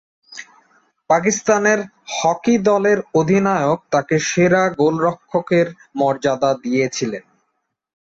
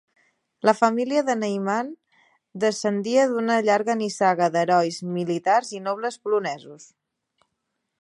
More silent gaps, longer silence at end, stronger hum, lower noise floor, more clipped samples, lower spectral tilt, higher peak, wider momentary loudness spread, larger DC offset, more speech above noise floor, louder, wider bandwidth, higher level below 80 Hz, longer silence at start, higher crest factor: neither; second, 0.9 s vs 1.15 s; neither; second, -72 dBFS vs -78 dBFS; neither; about the same, -5 dB/octave vs -5 dB/octave; about the same, -2 dBFS vs -2 dBFS; about the same, 10 LU vs 8 LU; neither; about the same, 55 dB vs 56 dB; first, -18 LUFS vs -23 LUFS; second, 8 kHz vs 11.5 kHz; first, -58 dBFS vs -76 dBFS; second, 0.3 s vs 0.65 s; second, 16 dB vs 22 dB